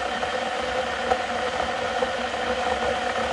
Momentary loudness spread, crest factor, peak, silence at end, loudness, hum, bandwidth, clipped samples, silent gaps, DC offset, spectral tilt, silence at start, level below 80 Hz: 2 LU; 20 dB; -6 dBFS; 0 s; -25 LUFS; none; 11.5 kHz; under 0.1%; none; under 0.1%; -3 dB/octave; 0 s; -48 dBFS